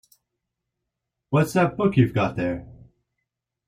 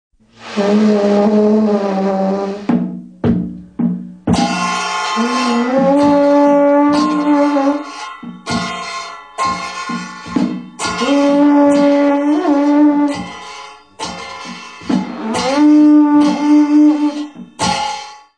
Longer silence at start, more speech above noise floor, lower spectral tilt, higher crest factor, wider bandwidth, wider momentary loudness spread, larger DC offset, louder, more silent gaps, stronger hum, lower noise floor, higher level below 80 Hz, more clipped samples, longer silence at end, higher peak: first, 1.3 s vs 0.4 s; first, 61 dB vs 22 dB; first, -7.5 dB/octave vs -5.5 dB/octave; first, 20 dB vs 12 dB; first, 15.5 kHz vs 10 kHz; second, 8 LU vs 16 LU; second, under 0.1% vs 0.1%; second, -22 LUFS vs -14 LUFS; neither; neither; first, -82 dBFS vs -34 dBFS; second, -54 dBFS vs -46 dBFS; neither; first, 1 s vs 0.2 s; second, -6 dBFS vs -2 dBFS